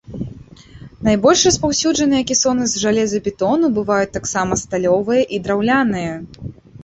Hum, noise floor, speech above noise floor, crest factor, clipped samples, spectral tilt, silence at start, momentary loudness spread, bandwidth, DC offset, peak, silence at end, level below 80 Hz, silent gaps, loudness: none; -40 dBFS; 23 dB; 16 dB; under 0.1%; -3.5 dB/octave; 0.1 s; 17 LU; 8.4 kHz; under 0.1%; -2 dBFS; 0.05 s; -42 dBFS; none; -16 LUFS